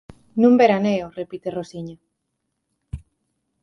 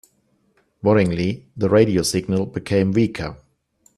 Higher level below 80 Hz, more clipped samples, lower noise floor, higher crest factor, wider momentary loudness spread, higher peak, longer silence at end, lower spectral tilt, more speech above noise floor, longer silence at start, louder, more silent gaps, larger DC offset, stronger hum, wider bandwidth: about the same, -48 dBFS vs -50 dBFS; neither; first, -76 dBFS vs -64 dBFS; about the same, 20 dB vs 20 dB; first, 24 LU vs 9 LU; second, -4 dBFS vs 0 dBFS; about the same, 0.65 s vs 0.6 s; about the same, -7 dB/octave vs -6 dB/octave; first, 57 dB vs 45 dB; second, 0.35 s vs 0.85 s; about the same, -19 LUFS vs -20 LUFS; neither; neither; neither; second, 6.4 kHz vs 13 kHz